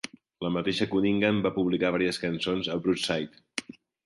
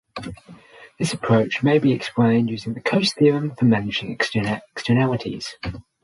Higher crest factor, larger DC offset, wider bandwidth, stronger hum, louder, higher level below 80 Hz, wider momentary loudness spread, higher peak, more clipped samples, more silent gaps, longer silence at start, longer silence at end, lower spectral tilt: about the same, 18 dB vs 16 dB; neither; about the same, 11.5 kHz vs 11.5 kHz; neither; second, -28 LUFS vs -21 LUFS; second, -58 dBFS vs -50 dBFS; about the same, 12 LU vs 12 LU; second, -10 dBFS vs -4 dBFS; neither; neither; about the same, 0.05 s vs 0.15 s; first, 0.45 s vs 0.2 s; about the same, -5.5 dB/octave vs -6 dB/octave